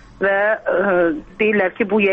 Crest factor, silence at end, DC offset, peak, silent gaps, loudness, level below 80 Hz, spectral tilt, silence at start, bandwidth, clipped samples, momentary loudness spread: 10 dB; 0 s; under 0.1%; -6 dBFS; none; -18 LUFS; -50 dBFS; -8 dB/octave; 0.2 s; 5.2 kHz; under 0.1%; 3 LU